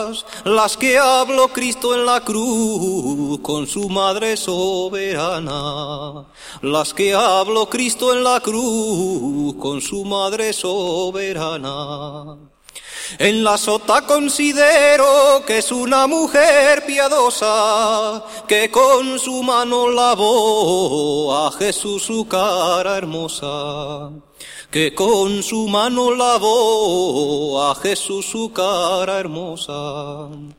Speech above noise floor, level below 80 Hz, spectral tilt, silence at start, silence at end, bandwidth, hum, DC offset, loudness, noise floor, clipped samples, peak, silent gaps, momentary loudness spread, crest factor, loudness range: 20 dB; -52 dBFS; -3 dB/octave; 0 s; 0.05 s; 16.5 kHz; none; under 0.1%; -16 LUFS; -37 dBFS; under 0.1%; 0 dBFS; none; 13 LU; 16 dB; 7 LU